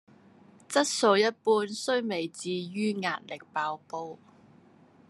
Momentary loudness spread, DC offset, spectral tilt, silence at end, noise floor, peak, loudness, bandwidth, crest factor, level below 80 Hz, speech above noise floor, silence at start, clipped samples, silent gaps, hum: 14 LU; under 0.1%; -3.5 dB/octave; 0.95 s; -58 dBFS; -8 dBFS; -29 LUFS; 13 kHz; 22 dB; -86 dBFS; 30 dB; 0.7 s; under 0.1%; none; none